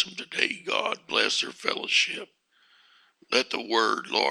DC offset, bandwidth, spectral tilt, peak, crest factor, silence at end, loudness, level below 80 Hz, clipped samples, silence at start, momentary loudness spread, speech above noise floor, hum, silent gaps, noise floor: under 0.1%; 15.5 kHz; -1 dB/octave; -4 dBFS; 24 dB; 0 s; -25 LUFS; -80 dBFS; under 0.1%; 0 s; 5 LU; 35 dB; none; none; -62 dBFS